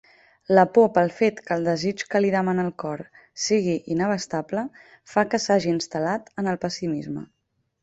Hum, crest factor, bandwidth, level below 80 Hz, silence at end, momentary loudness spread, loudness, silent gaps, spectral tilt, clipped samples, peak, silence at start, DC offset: none; 20 dB; 8.2 kHz; -62 dBFS; 0.55 s; 12 LU; -23 LUFS; none; -5 dB/octave; under 0.1%; -2 dBFS; 0.5 s; under 0.1%